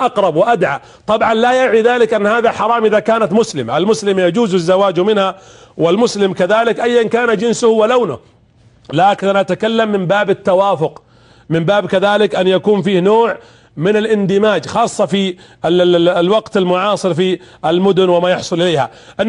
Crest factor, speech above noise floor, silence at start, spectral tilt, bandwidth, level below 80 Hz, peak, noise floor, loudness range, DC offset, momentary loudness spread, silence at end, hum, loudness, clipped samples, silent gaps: 12 dB; 35 dB; 0 s; -5.5 dB/octave; 11 kHz; -54 dBFS; -2 dBFS; -48 dBFS; 2 LU; under 0.1%; 6 LU; 0 s; none; -13 LUFS; under 0.1%; none